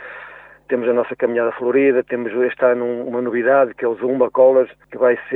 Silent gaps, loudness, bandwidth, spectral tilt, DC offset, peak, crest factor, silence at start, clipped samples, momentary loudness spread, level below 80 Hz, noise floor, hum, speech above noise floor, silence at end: none; -18 LUFS; 3.9 kHz; -9 dB/octave; under 0.1%; -2 dBFS; 14 dB; 0 s; under 0.1%; 10 LU; -64 dBFS; -40 dBFS; none; 23 dB; 0 s